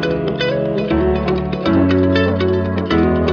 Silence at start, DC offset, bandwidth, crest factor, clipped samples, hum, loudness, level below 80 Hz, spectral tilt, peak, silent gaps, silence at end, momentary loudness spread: 0 s; under 0.1%; 7 kHz; 12 dB; under 0.1%; none; -16 LUFS; -32 dBFS; -8 dB/octave; -2 dBFS; none; 0 s; 5 LU